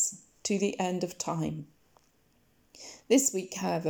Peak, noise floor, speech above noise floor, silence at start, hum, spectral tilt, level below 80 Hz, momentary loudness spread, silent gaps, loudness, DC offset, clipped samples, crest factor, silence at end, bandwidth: -12 dBFS; -68 dBFS; 38 dB; 0 s; none; -4 dB/octave; -68 dBFS; 20 LU; none; -30 LUFS; under 0.1%; under 0.1%; 20 dB; 0 s; over 20 kHz